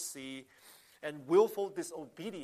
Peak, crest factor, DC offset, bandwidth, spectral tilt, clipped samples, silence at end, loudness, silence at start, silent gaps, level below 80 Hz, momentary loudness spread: -14 dBFS; 20 dB; under 0.1%; 15 kHz; -4.5 dB/octave; under 0.1%; 0 s; -34 LUFS; 0 s; none; -84 dBFS; 17 LU